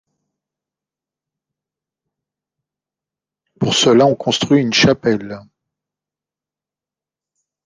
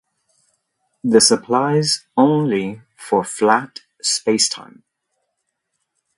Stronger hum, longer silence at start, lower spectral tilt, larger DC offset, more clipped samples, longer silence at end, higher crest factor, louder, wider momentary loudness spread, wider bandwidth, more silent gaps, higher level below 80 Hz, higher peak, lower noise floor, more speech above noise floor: neither; first, 3.6 s vs 1.05 s; about the same, -4.5 dB/octave vs -3.5 dB/octave; neither; neither; first, 2.25 s vs 1.55 s; about the same, 18 dB vs 20 dB; first, -14 LUFS vs -17 LUFS; second, 11 LU vs 14 LU; second, 10 kHz vs 11.5 kHz; neither; first, -54 dBFS vs -64 dBFS; about the same, -2 dBFS vs 0 dBFS; first, -89 dBFS vs -75 dBFS; first, 75 dB vs 58 dB